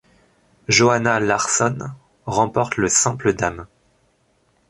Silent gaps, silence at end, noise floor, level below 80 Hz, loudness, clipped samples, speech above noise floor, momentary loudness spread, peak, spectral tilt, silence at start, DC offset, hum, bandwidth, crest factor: none; 1.05 s; -62 dBFS; -50 dBFS; -18 LUFS; under 0.1%; 44 dB; 18 LU; -2 dBFS; -3.5 dB/octave; 0.7 s; under 0.1%; none; 11.5 kHz; 18 dB